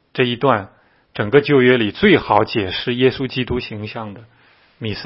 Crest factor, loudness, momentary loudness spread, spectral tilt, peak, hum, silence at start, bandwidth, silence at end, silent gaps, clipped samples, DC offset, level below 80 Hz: 18 dB; -17 LUFS; 17 LU; -10 dB/octave; 0 dBFS; none; 0.15 s; 5.8 kHz; 0 s; none; under 0.1%; under 0.1%; -46 dBFS